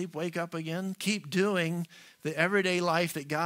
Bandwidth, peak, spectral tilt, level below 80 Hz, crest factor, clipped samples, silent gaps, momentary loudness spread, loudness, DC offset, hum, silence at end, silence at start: 16 kHz; -10 dBFS; -5 dB/octave; -76 dBFS; 20 dB; under 0.1%; none; 10 LU; -30 LUFS; under 0.1%; none; 0 s; 0 s